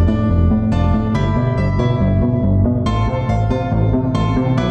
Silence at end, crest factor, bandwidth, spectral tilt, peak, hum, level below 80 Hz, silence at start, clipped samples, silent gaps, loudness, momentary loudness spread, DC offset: 0 s; 10 dB; 8.2 kHz; -9 dB/octave; -4 dBFS; none; -24 dBFS; 0 s; under 0.1%; none; -17 LUFS; 2 LU; under 0.1%